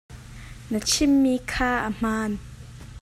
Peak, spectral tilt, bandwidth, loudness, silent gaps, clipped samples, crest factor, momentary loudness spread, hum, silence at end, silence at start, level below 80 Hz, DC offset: -10 dBFS; -3.5 dB/octave; 15 kHz; -23 LUFS; none; under 0.1%; 16 dB; 23 LU; none; 0.05 s; 0.1 s; -42 dBFS; under 0.1%